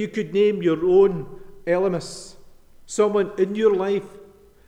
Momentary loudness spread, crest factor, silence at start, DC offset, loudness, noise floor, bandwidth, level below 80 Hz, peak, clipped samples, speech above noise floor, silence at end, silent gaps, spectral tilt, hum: 16 LU; 16 dB; 0 s; under 0.1%; -21 LUFS; -46 dBFS; 10.5 kHz; -52 dBFS; -6 dBFS; under 0.1%; 26 dB; 0.45 s; none; -6 dB/octave; none